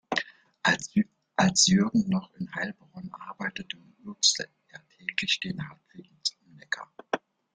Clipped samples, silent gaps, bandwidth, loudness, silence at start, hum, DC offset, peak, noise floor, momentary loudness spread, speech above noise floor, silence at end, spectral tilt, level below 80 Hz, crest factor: under 0.1%; none; 9.6 kHz; -27 LUFS; 0.1 s; none; under 0.1%; -8 dBFS; -52 dBFS; 19 LU; 24 dB; 0.4 s; -3 dB/octave; -64 dBFS; 22 dB